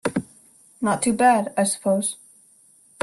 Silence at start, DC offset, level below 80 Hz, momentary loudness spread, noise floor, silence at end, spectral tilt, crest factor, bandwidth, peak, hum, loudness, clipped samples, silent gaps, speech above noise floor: 0.05 s; under 0.1%; -62 dBFS; 11 LU; -55 dBFS; 0.85 s; -4 dB/octave; 18 dB; 12.5 kHz; -6 dBFS; none; -21 LUFS; under 0.1%; none; 35 dB